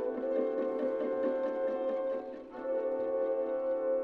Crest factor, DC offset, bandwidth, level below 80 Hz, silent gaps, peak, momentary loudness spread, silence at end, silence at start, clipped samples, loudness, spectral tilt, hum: 12 dB; under 0.1%; 4.5 kHz; -72 dBFS; none; -20 dBFS; 4 LU; 0 s; 0 s; under 0.1%; -33 LUFS; -7.5 dB/octave; none